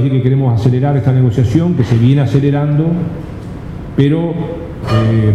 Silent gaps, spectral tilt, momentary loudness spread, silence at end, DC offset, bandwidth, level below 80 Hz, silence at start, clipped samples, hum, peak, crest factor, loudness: none; -9 dB/octave; 12 LU; 0 s; under 0.1%; 7.8 kHz; -34 dBFS; 0 s; under 0.1%; none; 0 dBFS; 12 dB; -13 LUFS